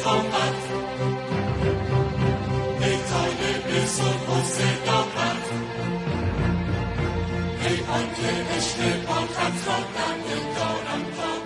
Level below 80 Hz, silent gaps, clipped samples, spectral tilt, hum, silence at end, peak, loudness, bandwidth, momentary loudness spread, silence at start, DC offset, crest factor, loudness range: -42 dBFS; none; under 0.1%; -4.5 dB/octave; none; 0 s; -10 dBFS; -25 LUFS; 11.5 kHz; 5 LU; 0 s; under 0.1%; 16 dB; 2 LU